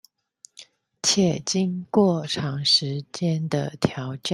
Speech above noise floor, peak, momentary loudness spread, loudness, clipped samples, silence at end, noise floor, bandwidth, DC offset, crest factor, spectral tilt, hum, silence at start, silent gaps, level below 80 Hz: 31 dB; -4 dBFS; 8 LU; -23 LUFS; under 0.1%; 0 s; -54 dBFS; 12 kHz; under 0.1%; 20 dB; -4.5 dB/octave; none; 0.6 s; none; -60 dBFS